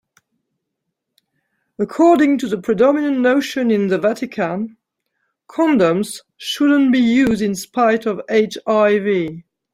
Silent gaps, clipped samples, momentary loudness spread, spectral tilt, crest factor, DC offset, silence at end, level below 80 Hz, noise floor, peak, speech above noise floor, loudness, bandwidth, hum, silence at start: none; under 0.1%; 12 LU; -5.5 dB/octave; 16 dB; under 0.1%; 0.35 s; -58 dBFS; -77 dBFS; -2 dBFS; 61 dB; -17 LUFS; 15.5 kHz; none; 1.8 s